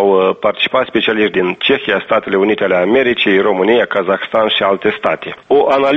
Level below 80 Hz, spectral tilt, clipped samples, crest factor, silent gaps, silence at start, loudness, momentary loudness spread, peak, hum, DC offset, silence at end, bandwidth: -52 dBFS; -6.5 dB/octave; under 0.1%; 12 dB; none; 0 s; -13 LUFS; 3 LU; 0 dBFS; none; under 0.1%; 0 s; 6.2 kHz